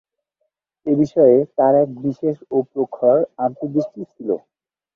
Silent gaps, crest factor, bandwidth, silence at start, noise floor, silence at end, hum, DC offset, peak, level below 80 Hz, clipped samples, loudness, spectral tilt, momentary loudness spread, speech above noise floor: none; 18 dB; 6.8 kHz; 0.85 s; -74 dBFS; 0.6 s; none; under 0.1%; -2 dBFS; -62 dBFS; under 0.1%; -18 LUFS; -10 dB/octave; 12 LU; 56 dB